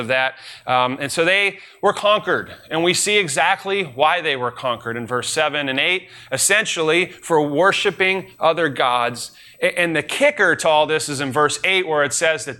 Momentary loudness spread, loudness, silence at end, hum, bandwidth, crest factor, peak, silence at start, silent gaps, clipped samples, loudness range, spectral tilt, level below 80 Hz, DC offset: 8 LU; -18 LUFS; 0.05 s; none; 17 kHz; 16 dB; -4 dBFS; 0 s; none; under 0.1%; 1 LU; -2.5 dB/octave; -62 dBFS; under 0.1%